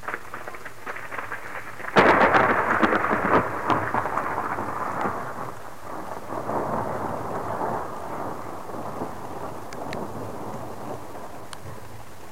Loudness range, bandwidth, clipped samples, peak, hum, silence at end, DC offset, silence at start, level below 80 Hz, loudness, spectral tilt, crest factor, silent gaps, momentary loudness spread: 14 LU; 16 kHz; under 0.1%; -2 dBFS; none; 0 s; 2%; 0 s; -54 dBFS; -26 LUFS; -5.5 dB/octave; 24 dB; none; 18 LU